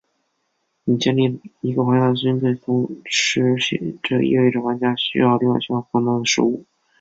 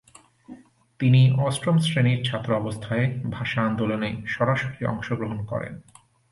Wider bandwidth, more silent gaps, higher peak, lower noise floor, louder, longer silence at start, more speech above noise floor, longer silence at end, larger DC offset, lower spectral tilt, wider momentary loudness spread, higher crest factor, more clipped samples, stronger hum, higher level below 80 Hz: second, 7.8 kHz vs 11.5 kHz; neither; first, -4 dBFS vs -8 dBFS; first, -71 dBFS vs -47 dBFS; first, -19 LUFS vs -24 LUFS; first, 0.85 s vs 0.5 s; first, 52 dB vs 24 dB; about the same, 0.4 s vs 0.5 s; neither; second, -5 dB/octave vs -6.5 dB/octave; second, 6 LU vs 10 LU; about the same, 16 dB vs 16 dB; neither; neither; second, -60 dBFS vs -54 dBFS